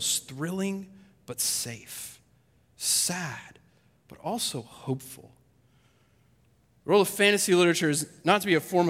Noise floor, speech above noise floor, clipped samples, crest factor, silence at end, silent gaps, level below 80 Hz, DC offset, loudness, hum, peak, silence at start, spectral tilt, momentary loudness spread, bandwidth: -64 dBFS; 37 dB; under 0.1%; 22 dB; 0 s; none; -70 dBFS; under 0.1%; -26 LUFS; none; -6 dBFS; 0 s; -3 dB/octave; 18 LU; 16.5 kHz